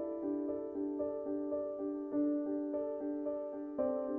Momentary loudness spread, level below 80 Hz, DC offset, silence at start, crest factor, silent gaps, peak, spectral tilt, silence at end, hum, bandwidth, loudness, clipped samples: 5 LU; -72 dBFS; under 0.1%; 0 s; 14 dB; none; -22 dBFS; -9.5 dB/octave; 0 s; none; 2.5 kHz; -38 LUFS; under 0.1%